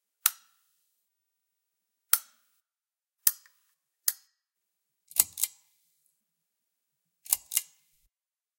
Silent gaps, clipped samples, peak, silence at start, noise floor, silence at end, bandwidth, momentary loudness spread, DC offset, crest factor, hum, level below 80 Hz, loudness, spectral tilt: none; under 0.1%; 0 dBFS; 0.25 s; under -90 dBFS; 0.95 s; 17 kHz; 6 LU; under 0.1%; 36 dB; none; -78 dBFS; -28 LUFS; 3.5 dB/octave